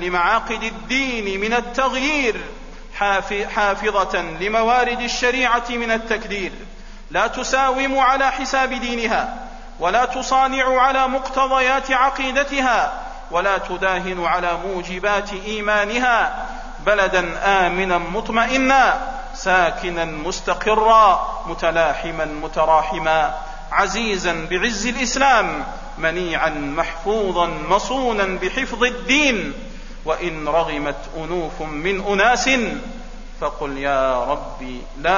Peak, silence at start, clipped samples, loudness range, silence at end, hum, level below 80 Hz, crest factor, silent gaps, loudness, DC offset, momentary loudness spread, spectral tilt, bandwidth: -2 dBFS; 0 s; under 0.1%; 3 LU; 0 s; none; -34 dBFS; 18 dB; none; -19 LUFS; 0.5%; 11 LU; -3 dB/octave; 7.4 kHz